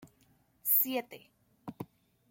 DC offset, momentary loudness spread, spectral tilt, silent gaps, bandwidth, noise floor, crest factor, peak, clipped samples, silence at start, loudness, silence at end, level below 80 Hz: under 0.1%; 24 LU; -3 dB/octave; none; 17 kHz; -69 dBFS; 22 dB; -14 dBFS; under 0.1%; 0 s; -29 LUFS; 0.45 s; -80 dBFS